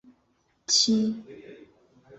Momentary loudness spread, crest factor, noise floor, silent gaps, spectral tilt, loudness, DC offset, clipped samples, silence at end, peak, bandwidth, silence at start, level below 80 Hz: 25 LU; 20 dB; -69 dBFS; none; -2.5 dB/octave; -23 LUFS; under 0.1%; under 0.1%; 0.05 s; -10 dBFS; 8.4 kHz; 0.7 s; -70 dBFS